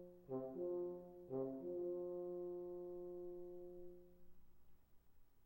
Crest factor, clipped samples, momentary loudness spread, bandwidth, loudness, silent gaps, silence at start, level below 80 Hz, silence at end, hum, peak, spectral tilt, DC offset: 16 dB; under 0.1%; 10 LU; 16 kHz; -49 LUFS; none; 0 s; -74 dBFS; 0 s; none; -34 dBFS; -10.5 dB/octave; under 0.1%